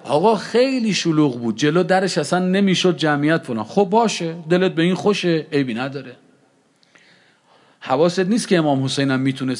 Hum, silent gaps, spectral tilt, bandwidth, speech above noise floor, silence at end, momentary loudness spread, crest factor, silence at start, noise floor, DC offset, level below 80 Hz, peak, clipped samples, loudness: none; none; -5.5 dB/octave; 11.5 kHz; 40 dB; 0 s; 5 LU; 16 dB; 0.05 s; -58 dBFS; under 0.1%; -72 dBFS; -2 dBFS; under 0.1%; -18 LUFS